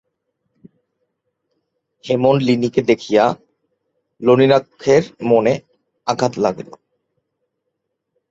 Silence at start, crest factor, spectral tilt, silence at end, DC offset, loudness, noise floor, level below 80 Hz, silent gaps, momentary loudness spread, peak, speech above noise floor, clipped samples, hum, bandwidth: 2.05 s; 18 dB; -6.5 dB/octave; 1.7 s; under 0.1%; -16 LUFS; -75 dBFS; -58 dBFS; none; 11 LU; -2 dBFS; 60 dB; under 0.1%; none; 7.8 kHz